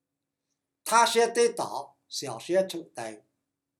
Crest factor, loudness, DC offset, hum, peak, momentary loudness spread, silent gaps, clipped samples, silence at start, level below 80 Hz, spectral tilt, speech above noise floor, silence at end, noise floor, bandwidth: 22 dB; -26 LUFS; under 0.1%; none; -8 dBFS; 17 LU; none; under 0.1%; 0.85 s; -88 dBFS; -2.5 dB/octave; 59 dB; 0.65 s; -85 dBFS; 17.5 kHz